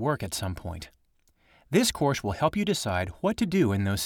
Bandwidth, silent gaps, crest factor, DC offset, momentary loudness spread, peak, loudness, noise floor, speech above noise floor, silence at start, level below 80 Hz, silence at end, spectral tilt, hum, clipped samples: 18.5 kHz; none; 18 dB; under 0.1%; 13 LU; -10 dBFS; -27 LUFS; -66 dBFS; 40 dB; 0 s; -50 dBFS; 0 s; -5 dB/octave; none; under 0.1%